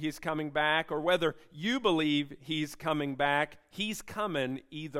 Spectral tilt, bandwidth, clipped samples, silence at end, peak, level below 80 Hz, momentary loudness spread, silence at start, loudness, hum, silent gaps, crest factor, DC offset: -4.5 dB/octave; 16 kHz; under 0.1%; 0 s; -12 dBFS; -62 dBFS; 8 LU; 0 s; -31 LUFS; none; none; 18 dB; under 0.1%